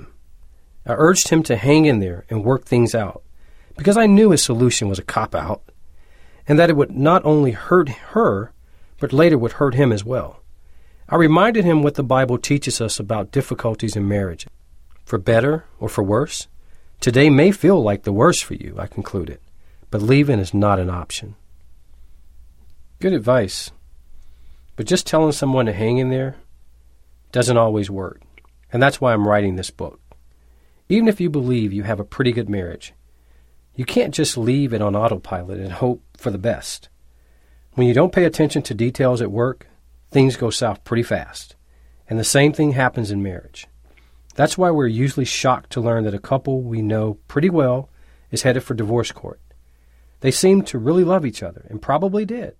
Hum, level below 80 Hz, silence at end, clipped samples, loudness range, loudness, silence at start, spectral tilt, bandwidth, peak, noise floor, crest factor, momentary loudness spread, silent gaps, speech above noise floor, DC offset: none; -44 dBFS; 0.1 s; under 0.1%; 5 LU; -18 LUFS; 0.05 s; -5.5 dB/octave; 16 kHz; -2 dBFS; -51 dBFS; 18 dB; 14 LU; none; 34 dB; under 0.1%